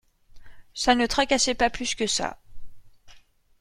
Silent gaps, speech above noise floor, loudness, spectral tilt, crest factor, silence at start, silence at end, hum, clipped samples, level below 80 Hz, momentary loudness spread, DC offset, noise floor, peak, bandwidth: none; 29 dB; -24 LUFS; -1.5 dB/octave; 24 dB; 0.35 s; 0.4 s; none; under 0.1%; -46 dBFS; 7 LU; under 0.1%; -53 dBFS; -4 dBFS; 16 kHz